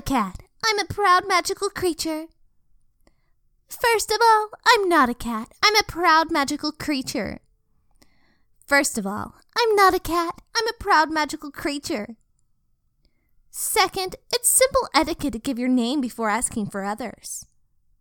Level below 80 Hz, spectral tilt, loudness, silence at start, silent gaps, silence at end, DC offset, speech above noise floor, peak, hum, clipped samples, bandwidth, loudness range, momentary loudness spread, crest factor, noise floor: -48 dBFS; -2 dB/octave; -21 LUFS; 0.05 s; none; 0.6 s; under 0.1%; 45 dB; -4 dBFS; none; under 0.1%; 19 kHz; 6 LU; 13 LU; 20 dB; -66 dBFS